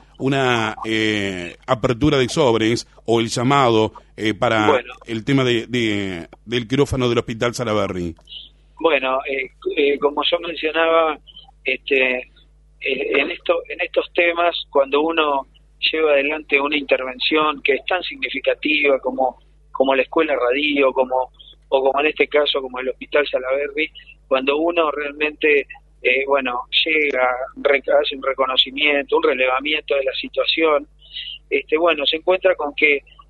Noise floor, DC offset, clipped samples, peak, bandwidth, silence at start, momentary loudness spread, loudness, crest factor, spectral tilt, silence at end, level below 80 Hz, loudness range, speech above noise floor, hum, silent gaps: -50 dBFS; under 0.1%; under 0.1%; 0 dBFS; 11.5 kHz; 0.2 s; 8 LU; -19 LUFS; 18 dB; -5 dB/octave; 0.3 s; -48 dBFS; 3 LU; 31 dB; none; none